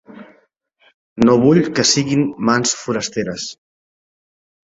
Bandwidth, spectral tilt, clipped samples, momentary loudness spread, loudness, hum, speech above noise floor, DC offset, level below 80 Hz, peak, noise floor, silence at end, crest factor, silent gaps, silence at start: 8 kHz; -4 dB/octave; under 0.1%; 13 LU; -16 LUFS; none; 43 dB; under 0.1%; -54 dBFS; -2 dBFS; -59 dBFS; 1.15 s; 18 dB; 0.94-1.16 s; 0.15 s